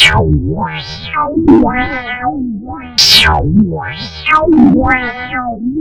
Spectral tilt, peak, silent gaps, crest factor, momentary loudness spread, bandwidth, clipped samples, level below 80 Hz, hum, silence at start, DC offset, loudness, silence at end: -4.5 dB/octave; 0 dBFS; none; 12 dB; 14 LU; 16.5 kHz; 0.2%; -26 dBFS; none; 0 s; under 0.1%; -11 LUFS; 0 s